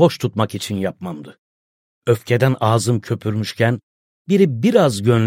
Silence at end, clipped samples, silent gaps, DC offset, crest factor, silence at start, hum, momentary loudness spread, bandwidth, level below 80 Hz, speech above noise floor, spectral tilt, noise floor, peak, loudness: 0 s; under 0.1%; 1.38-2.02 s, 3.83-4.25 s; under 0.1%; 16 dB; 0 s; none; 12 LU; 16 kHz; -58 dBFS; over 73 dB; -6.5 dB/octave; under -90 dBFS; -2 dBFS; -18 LUFS